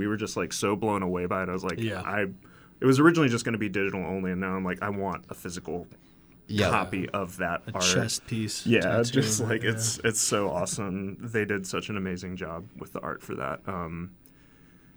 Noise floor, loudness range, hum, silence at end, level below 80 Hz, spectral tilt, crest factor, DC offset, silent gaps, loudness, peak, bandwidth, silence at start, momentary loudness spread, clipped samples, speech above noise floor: -55 dBFS; 7 LU; none; 0.85 s; -60 dBFS; -4.5 dB/octave; 22 dB; under 0.1%; none; -28 LUFS; -6 dBFS; over 20 kHz; 0 s; 12 LU; under 0.1%; 27 dB